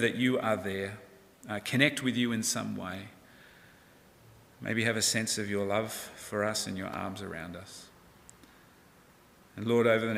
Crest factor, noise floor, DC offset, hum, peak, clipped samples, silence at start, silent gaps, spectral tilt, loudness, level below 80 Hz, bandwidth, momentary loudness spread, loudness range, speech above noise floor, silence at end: 24 dB; -59 dBFS; under 0.1%; none; -8 dBFS; under 0.1%; 0 s; none; -3.5 dB/octave; -31 LUFS; -68 dBFS; 16 kHz; 17 LU; 6 LU; 28 dB; 0 s